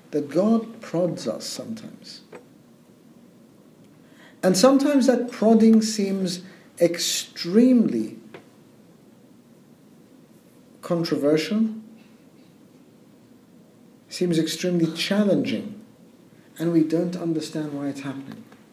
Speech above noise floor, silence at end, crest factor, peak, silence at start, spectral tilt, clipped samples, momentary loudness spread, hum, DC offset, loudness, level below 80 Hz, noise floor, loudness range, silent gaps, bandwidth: 31 dB; 0.3 s; 22 dB; -2 dBFS; 0.1 s; -5 dB/octave; under 0.1%; 21 LU; none; under 0.1%; -22 LUFS; -74 dBFS; -52 dBFS; 11 LU; none; 15.5 kHz